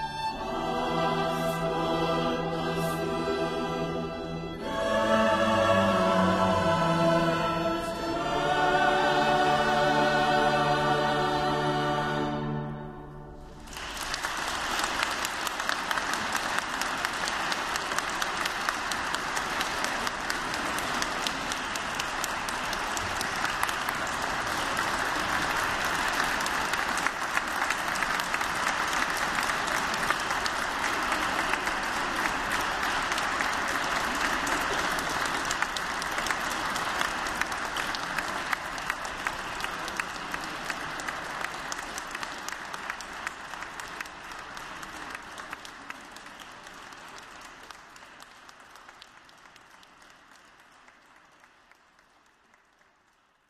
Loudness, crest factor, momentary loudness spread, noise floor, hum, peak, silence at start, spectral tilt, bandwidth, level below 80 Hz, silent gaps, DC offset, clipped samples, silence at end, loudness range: -28 LUFS; 24 dB; 15 LU; -66 dBFS; none; -6 dBFS; 0 s; -3.5 dB/octave; 16 kHz; -50 dBFS; none; under 0.1%; under 0.1%; 3.4 s; 13 LU